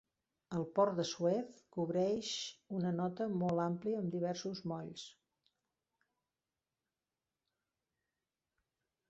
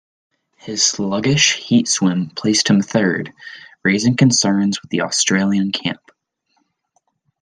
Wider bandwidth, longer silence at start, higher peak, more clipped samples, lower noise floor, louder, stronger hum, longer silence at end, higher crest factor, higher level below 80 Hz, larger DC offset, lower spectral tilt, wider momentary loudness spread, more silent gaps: second, 7.6 kHz vs 10.5 kHz; second, 0.5 s vs 0.65 s; second, -20 dBFS vs -2 dBFS; neither; first, under -90 dBFS vs -67 dBFS; second, -38 LUFS vs -16 LUFS; neither; first, 4 s vs 1.45 s; about the same, 20 dB vs 18 dB; second, -78 dBFS vs -58 dBFS; neither; first, -6 dB/octave vs -3.5 dB/octave; second, 10 LU vs 13 LU; neither